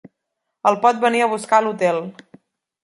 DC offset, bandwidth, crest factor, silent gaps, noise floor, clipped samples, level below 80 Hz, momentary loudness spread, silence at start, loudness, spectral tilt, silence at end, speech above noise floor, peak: under 0.1%; 11.5 kHz; 18 dB; none; -78 dBFS; under 0.1%; -72 dBFS; 6 LU; 0.65 s; -18 LUFS; -4.5 dB/octave; 0.7 s; 61 dB; -2 dBFS